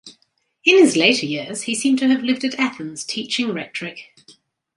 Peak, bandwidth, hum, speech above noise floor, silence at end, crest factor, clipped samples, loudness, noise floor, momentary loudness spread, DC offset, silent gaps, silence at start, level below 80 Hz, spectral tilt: 0 dBFS; 11.5 kHz; none; 46 dB; 0.75 s; 20 dB; under 0.1%; -18 LUFS; -65 dBFS; 16 LU; under 0.1%; none; 0.05 s; -70 dBFS; -3 dB/octave